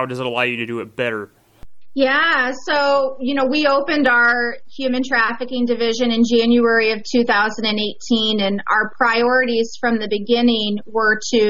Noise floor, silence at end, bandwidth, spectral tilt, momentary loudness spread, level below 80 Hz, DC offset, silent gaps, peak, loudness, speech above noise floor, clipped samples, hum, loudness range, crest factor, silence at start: -37 dBFS; 0 s; 7.8 kHz; -4 dB/octave; 8 LU; -54 dBFS; 2%; none; -4 dBFS; -17 LUFS; 19 dB; under 0.1%; none; 2 LU; 14 dB; 0 s